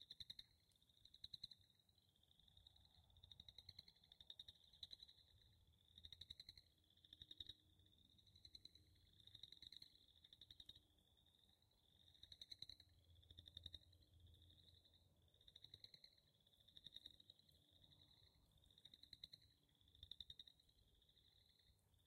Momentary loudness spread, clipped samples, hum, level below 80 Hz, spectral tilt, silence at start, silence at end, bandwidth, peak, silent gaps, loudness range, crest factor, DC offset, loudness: 10 LU; under 0.1%; none; -82 dBFS; -2.5 dB/octave; 0 s; 0 s; 16 kHz; -40 dBFS; none; 3 LU; 26 dB; under 0.1%; -62 LUFS